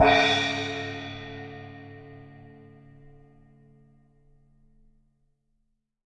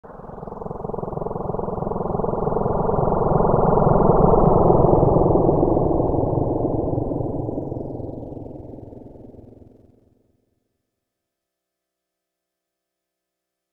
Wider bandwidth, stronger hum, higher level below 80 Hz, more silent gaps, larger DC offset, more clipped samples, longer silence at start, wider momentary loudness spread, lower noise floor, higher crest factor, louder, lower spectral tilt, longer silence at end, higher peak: first, 9.6 kHz vs 2.3 kHz; second, none vs 60 Hz at -45 dBFS; second, -56 dBFS vs -32 dBFS; neither; neither; neither; about the same, 0 s vs 0.05 s; first, 28 LU vs 20 LU; second, -74 dBFS vs -82 dBFS; about the same, 24 dB vs 20 dB; second, -26 LUFS vs -20 LUFS; second, -4 dB/octave vs -13.5 dB/octave; second, 3.6 s vs 4.2 s; second, -6 dBFS vs -2 dBFS